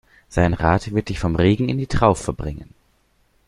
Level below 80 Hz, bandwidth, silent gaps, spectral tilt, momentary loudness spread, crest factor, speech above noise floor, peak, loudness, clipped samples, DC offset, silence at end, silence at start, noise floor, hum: -34 dBFS; 11.5 kHz; none; -7 dB/octave; 11 LU; 20 dB; 43 dB; -2 dBFS; -20 LUFS; under 0.1%; under 0.1%; 0.85 s; 0.3 s; -62 dBFS; none